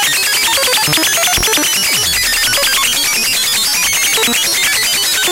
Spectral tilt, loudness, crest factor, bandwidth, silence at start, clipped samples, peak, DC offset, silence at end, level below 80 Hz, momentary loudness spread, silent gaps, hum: 0.5 dB/octave; -10 LUFS; 12 dB; 17.5 kHz; 0 s; under 0.1%; 0 dBFS; under 0.1%; 0 s; -38 dBFS; 1 LU; none; none